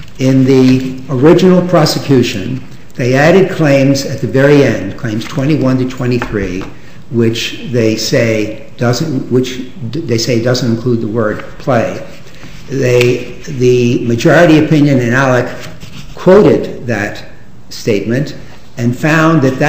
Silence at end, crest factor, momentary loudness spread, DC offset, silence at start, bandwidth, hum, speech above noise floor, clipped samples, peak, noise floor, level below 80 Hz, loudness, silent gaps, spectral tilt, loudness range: 0 s; 12 dB; 14 LU; 5%; 0 s; 16 kHz; none; 22 dB; 0.4%; 0 dBFS; -32 dBFS; -38 dBFS; -11 LUFS; none; -6 dB/octave; 5 LU